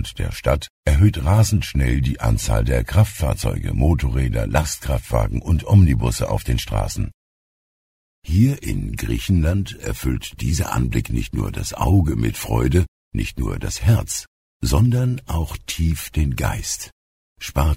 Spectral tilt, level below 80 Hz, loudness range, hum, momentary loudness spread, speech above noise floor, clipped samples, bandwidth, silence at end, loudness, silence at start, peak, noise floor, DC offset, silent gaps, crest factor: -6 dB/octave; -26 dBFS; 4 LU; none; 9 LU; over 71 dB; under 0.1%; 16 kHz; 0 s; -21 LUFS; 0 s; -2 dBFS; under -90 dBFS; under 0.1%; 0.70-0.83 s, 7.14-8.22 s, 12.88-13.11 s, 14.27-14.60 s, 16.92-17.36 s; 18 dB